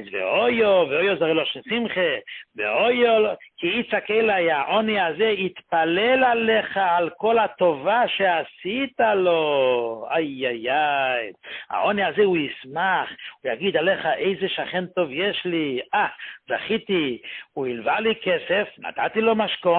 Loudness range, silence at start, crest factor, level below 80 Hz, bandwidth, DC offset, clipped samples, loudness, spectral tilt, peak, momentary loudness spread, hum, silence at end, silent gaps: 4 LU; 0 s; 14 dB; -64 dBFS; 4.4 kHz; under 0.1%; under 0.1%; -22 LUFS; -9.5 dB/octave; -8 dBFS; 9 LU; none; 0 s; none